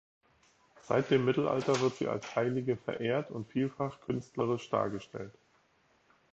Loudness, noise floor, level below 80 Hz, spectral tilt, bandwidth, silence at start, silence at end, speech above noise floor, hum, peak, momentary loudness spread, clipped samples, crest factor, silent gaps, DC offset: -33 LUFS; -70 dBFS; -70 dBFS; -6.5 dB/octave; 8.2 kHz; 0.85 s; 1.05 s; 38 dB; none; -14 dBFS; 9 LU; under 0.1%; 20 dB; none; under 0.1%